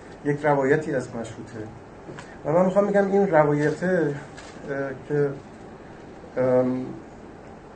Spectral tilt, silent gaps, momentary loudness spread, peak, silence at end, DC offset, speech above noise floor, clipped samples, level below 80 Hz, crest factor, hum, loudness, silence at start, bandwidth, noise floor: -7.5 dB/octave; none; 23 LU; -4 dBFS; 0 s; under 0.1%; 20 dB; under 0.1%; -56 dBFS; 20 dB; none; -23 LUFS; 0 s; 9 kHz; -43 dBFS